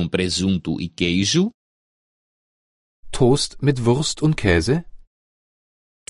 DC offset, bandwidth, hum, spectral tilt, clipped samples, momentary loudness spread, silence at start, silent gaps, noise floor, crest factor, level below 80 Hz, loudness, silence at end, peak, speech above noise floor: under 0.1%; 11.5 kHz; none; -5 dB/octave; under 0.1%; 6 LU; 0 s; 1.54-3.03 s; under -90 dBFS; 20 dB; -38 dBFS; -20 LUFS; 1.1 s; -2 dBFS; over 71 dB